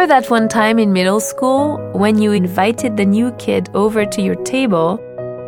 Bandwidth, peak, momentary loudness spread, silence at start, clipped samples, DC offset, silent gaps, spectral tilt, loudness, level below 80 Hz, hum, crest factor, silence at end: 18 kHz; 0 dBFS; 6 LU; 0 s; under 0.1%; under 0.1%; none; -5.5 dB/octave; -15 LUFS; -54 dBFS; none; 14 dB; 0 s